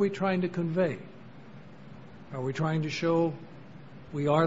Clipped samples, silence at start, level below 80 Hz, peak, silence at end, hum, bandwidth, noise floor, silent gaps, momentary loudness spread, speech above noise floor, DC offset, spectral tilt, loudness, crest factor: under 0.1%; 0 s; -62 dBFS; -10 dBFS; 0 s; none; 7.8 kHz; -49 dBFS; none; 22 LU; 21 dB; 0.3%; -7.5 dB/octave; -30 LUFS; 20 dB